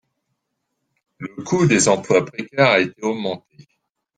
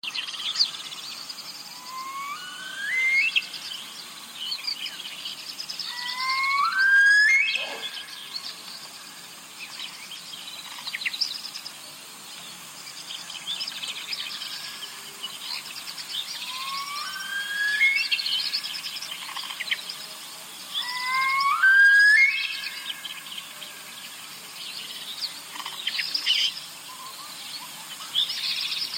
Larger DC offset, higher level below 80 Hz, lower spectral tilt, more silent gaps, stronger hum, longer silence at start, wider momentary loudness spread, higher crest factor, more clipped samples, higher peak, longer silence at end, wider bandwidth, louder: neither; first, -60 dBFS vs -82 dBFS; first, -4.5 dB/octave vs 2 dB/octave; neither; neither; first, 1.2 s vs 0.05 s; about the same, 18 LU vs 19 LU; about the same, 20 dB vs 18 dB; neither; first, -2 dBFS vs -10 dBFS; first, 0.8 s vs 0 s; second, 10 kHz vs 17 kHz; first, -18 LUFS vs -24 LUFS